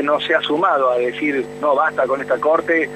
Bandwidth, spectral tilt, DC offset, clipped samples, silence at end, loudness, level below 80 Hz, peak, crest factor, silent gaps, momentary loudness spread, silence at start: 12 kHz; -5 dB/octave; under 0.1%; under 0.1%; 0 s; -18 LUFS; -58 dBFS; -4 dBFS; 14 dB; none; 5 LU; 0 s